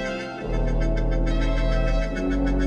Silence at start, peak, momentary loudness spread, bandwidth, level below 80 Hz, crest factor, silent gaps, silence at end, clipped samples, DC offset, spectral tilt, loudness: 0 s; -12 dBFS; 5 LU; 7 kHz; -24 dBFS; 10 dB; none; 0 s; under 0.1%; under 0.1%; -7 dB/octave; -26 LUFS